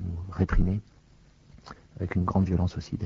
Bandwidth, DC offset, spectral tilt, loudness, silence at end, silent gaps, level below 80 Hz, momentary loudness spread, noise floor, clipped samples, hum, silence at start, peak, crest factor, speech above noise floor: 7.2 kHz; under 0.1%; -8.5 dB/octave; -28 LUFS; 0 s; none; -34 dBFS; 22 LU; -57 dBFS; under 0.1%; none; 0 s; -10 dBFS; 18 dB; 31 dB